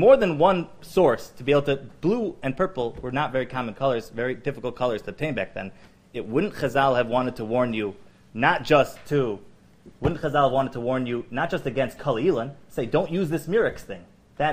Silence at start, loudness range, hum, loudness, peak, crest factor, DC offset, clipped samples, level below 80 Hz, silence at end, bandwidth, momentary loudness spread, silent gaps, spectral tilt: 0 s; 4 LU; none; -24 LUFS; -4 dBFS; 20 dB; under 0.1%; under 0.1%; -48 dBFS; 0 s; 15.5 kHz; 10 LU; none; -6.5 dB/octave